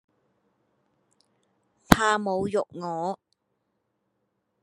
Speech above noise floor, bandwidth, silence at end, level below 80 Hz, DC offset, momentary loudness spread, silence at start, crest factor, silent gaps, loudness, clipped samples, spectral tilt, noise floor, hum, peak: 50 dB; 11.5 kHz; 1.5 s; -46 dBFS; under 0.1%; 13 LU; 1.9 s; 30 dB; none; -25 LUFS; under 0.1%; -5 dB/octave; -77 dBFS; none; 0 dBFS